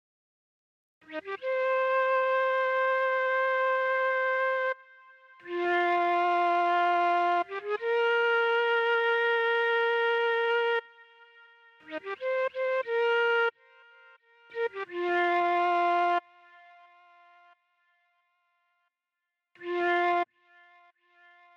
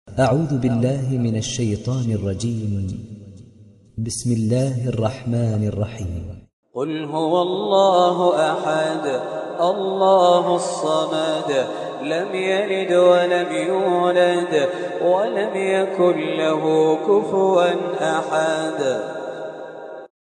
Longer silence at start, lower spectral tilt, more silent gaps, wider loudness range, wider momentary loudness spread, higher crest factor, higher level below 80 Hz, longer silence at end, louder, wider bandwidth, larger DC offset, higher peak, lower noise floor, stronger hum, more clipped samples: first, 1.1 s vs 0.05 s; second, -3 dB/octave vs -6 dB/octave; second, none vs 6.53-6.63 s; about the same, 8 LU vs 6 LU; second, 9 LU vs 13 LU; second, 12 dB vs 18 dB; second, under -90 dBFS vs -50 dBFS; first, 1.3 s vs 0.2 s; second, -27 LUFS vs -20 LUFS; second, 7.2 kHz vs 11.5 kHz; neither; second, -18 dBFS vs -2 dBFS; first, -87 dBFS vs -47 dBFS; neither; neither